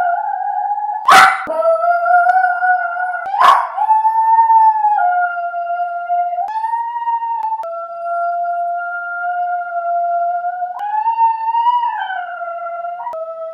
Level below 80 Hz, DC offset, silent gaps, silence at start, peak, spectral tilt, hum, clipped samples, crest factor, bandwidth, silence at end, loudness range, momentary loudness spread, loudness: -64 dBFS; under 0.1%; none; 0 s; 0 dBFS; -1 dB/octave; none; under 0.1%; 16 dB; 15.5 kHz; 0 s; 7 LU; 12 LU; -15 LUFS